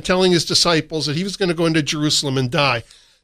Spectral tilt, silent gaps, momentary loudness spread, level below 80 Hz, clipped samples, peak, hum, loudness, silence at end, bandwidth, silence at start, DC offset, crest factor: -4 dB/octave; none; 7 LU; -46 dBFS; under 0.1%; -2 dBFS; none; -17 LUFS; 0.4 s; 15.5 kHz; 0 s; under 0.1%; 16 dB